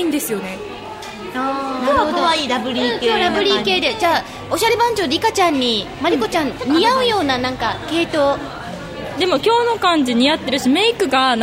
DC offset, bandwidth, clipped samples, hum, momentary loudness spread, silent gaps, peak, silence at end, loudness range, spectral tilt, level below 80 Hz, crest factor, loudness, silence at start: under 0.1%; 16 kHz; under 0.1%; none; 12 LU; none; -2 dBFS; 0 s; 2 LU; -3.5 dB/octave; -46 dBFS; 14 dB; -17 LUFS; 0 s